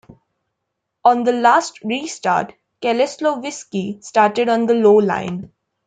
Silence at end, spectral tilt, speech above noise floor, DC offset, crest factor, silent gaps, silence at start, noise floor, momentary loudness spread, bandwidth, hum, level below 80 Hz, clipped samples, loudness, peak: 0.4 s; -5 dB/octave; 60 dB; under 0.1%; 16 dB; none; 1.05 s; -77 dBFS; 12 LU; 9.4 kHz; none; -64 dBFS; under 0.1%; -17 LUFS; -2 dBFS